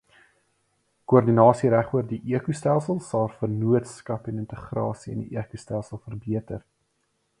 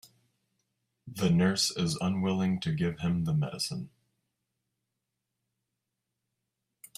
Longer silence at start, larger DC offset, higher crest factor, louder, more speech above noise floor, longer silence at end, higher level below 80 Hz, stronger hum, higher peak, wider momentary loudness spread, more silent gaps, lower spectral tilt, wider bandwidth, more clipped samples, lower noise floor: about the same, 1.1 s vs 1.05 s; neither; about the same, 22 dB vs 18 dB; first, -25 LUFS vs -29 LUFS; second, 49 dB vs 56 dB; second, 0.8 s vs 3.1 s; first, -56 dBFS vs -62 dBFS; neither; first, -2 dBFS vs -14 dBFS; first, 16 LU vs 9 LU; neither; first, -8.5 dB/octave vs -5 dB/octave; second, 11 kHz vs 14.5 kHz; neither; second, -72 dBFS vs -85 dBFS